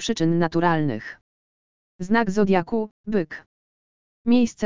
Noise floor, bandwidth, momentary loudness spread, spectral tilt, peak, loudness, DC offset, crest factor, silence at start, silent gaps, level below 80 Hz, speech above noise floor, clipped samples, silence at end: under -90 dBFS; 7.6 kHz; 13 LU; -6 dB/octave; -4 dBFS; -23 LUFS; 2%; 18 dB; 0 s; 1.21-1.99 s, 2.91-3.04 s, 3.46-4.25 s; -54 dBFS; over 68 dB; under 0.1%; 0 s